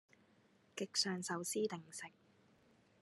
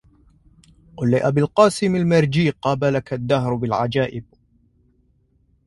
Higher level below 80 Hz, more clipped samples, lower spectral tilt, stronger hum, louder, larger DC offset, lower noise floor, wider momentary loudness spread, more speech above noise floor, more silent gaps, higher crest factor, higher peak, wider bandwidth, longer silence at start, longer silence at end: second, under -90 dBFS vs -50 dBFS; neither; second, -3 dB/octave vs -6.5 dB/octave; neither; second, -41 LUFS vs -19 LUFS; neither; first, -72 dBFS vs -61 dBFS; first, 15 LU vs 8 LU; second, 30 dB vs 42 dB; neither; about the same, 22 dB vs 20 dB; second, -22 dBFS vs 0 dBFS; about the same, 12.5 kHz vs 11.5 kHz; second, 0.75 s vs 0.95 s; second, 0.9 s vs 1.45 s